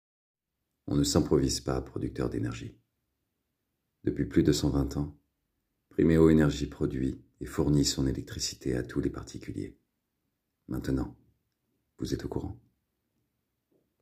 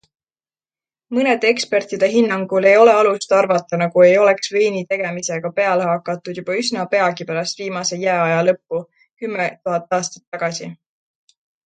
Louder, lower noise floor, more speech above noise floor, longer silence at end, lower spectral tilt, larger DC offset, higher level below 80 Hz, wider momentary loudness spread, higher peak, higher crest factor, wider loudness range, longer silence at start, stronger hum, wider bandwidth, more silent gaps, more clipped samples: second, -29 LUFS vs -17 LUFS; second, -84 dBFS vs under -90 dBFS; second, 56 dB vs over 73 dB; first, 1.45 s vs 0.9 s; about the same, -5.5 dB/octave vs -4.5 dB/octave; neither; first, -46 dBFS vs -70 dBFS; first, 15 LU vs 12 LU; second, -10 dBFS vs 0 dBFS; about the same, 20 dB vs 18 dB; first, 11 LU vs 6 LU; second, 0.85 s vs 1.1 s; neither; first, 16 kHz vs 9.4 kHz; second, none vs 9.13-9.17 s, 10.27-10.32 s; neither